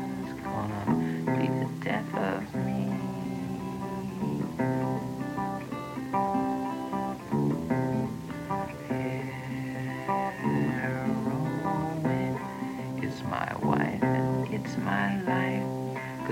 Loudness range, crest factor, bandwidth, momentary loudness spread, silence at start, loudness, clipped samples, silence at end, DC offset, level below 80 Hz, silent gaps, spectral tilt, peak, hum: 3 LU; 20 dB; 17 kHz; 7 LU; 0 s; -31 LUFS; under 0.1%; 0 s; under 0.1%; -58 dBFS; none; -7.5 dB/octave; -10 dBFS; none